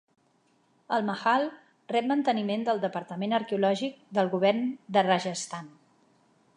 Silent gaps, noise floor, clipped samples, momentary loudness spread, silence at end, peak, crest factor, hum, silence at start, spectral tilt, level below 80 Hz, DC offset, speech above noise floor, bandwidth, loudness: none; -68 dBFS; under 0.1%; 8 LU; 0.9 s; -8 dBFS; 20 dB; none; 0.9 s; -5 dB/octave; -82 dBFS; under 0.1%; 40 dB; 11 kHz; -28 LUFS